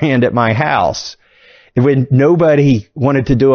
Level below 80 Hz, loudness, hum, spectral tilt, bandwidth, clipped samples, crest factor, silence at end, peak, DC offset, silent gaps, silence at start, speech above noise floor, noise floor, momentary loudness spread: -38 dBFS; -13 LUFS; none; -7.5 dB/octave; 6.8 kHz; under 0.1%; 12 dB; 0 s; 0 dBFS; under 0.1%; none; 0 s; 34 dB; -46 dBFS; 8 LU